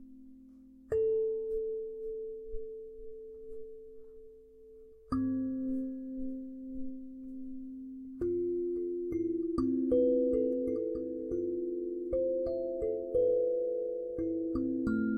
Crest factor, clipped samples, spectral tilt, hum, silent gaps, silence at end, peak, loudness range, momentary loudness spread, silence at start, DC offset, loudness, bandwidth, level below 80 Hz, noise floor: 16 dB; under 0.1%; -10 dB/octave; none; none; 0 s; -18 dBFS; 9 LU; 18 LU; 0 s; under 0.1%; -34 LUFS; 5.2 kHz; -56 dBFS; -55 dBFS